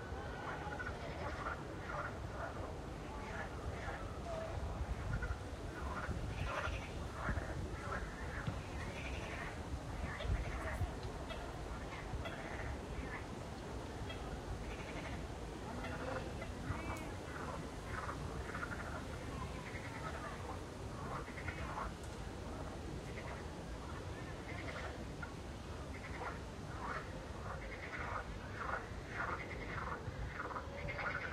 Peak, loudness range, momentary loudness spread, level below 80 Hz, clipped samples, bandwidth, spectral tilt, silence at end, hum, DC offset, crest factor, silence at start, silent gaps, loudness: -26 dBFS; 3 LU; 5 LU; -50 dBFS; under 0.1%; 15.5 kHz; -5.5 dB/octave; 0 s; none; under 0.1%; 18 dB; 0 s; none; -45 LUFS